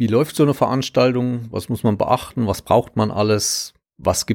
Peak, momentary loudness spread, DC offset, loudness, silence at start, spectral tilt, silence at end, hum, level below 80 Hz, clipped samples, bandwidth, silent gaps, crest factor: -2 dBFS; 7 LU; under 0.1%; -19 LUFS; 0 s; -5 dB/octave; 0 s; none; -48 dBFS; under 0.1%; 18.5 kHz; none; 16 dB